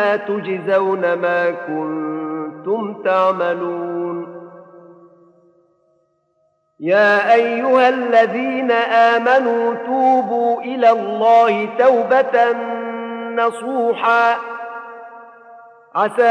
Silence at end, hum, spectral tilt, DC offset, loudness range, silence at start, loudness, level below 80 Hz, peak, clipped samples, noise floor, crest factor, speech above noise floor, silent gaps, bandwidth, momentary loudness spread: 0 s; none; -5.5 dB/octave; under 0.1%; 8 LU; 0 s; -16 LUFS; -78 dBFS; 0 dBFS; under 0.1%; -64 dBFS; 16 dB; 48 dB; none; 10 kHz; 13 LU